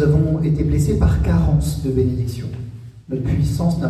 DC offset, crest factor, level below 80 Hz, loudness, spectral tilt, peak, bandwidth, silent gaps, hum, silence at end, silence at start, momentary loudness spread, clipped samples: under 0.1%; 12 dB; -26 dBFS; -19 LUFS; -8 dB/octave; -6 dBFS; 13.5 kHz; none; none; 0 s; 0 s; 13 LU; under 0.1%